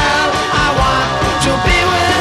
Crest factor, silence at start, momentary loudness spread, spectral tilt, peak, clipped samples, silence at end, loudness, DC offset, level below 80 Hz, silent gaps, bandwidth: 12 dB; 0 s; 2 LU; -4 dB/octave; -2 dBFS; under 0.1%; 0 s; -13 LUFS; under 0.1%; -24 dBFS; none; 14 kHz